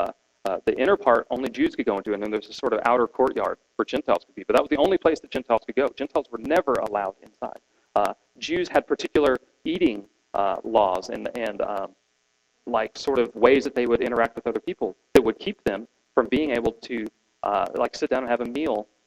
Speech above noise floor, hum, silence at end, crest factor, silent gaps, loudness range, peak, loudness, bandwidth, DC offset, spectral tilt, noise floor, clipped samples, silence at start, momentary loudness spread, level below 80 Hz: 46 dB; none; 0.25 s; 22 dB; none; 3 LU; -2 dBFS; -24 LUFS; 14.5 kHz; under 0.1%; -5 dB/octave; -70 dBFS; under 0.1%; 0 s; 11 LU; -54 dBFS